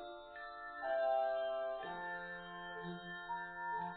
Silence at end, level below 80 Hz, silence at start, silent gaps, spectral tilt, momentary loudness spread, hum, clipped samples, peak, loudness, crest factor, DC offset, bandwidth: 0 s; -72 dBFS; 0 s; none; -2.5 dB/octave; 12 LU; none; under 0.1%; -26 dBFS; -42 LUFS; 16 dB; under 0.1%; 4.5 kHz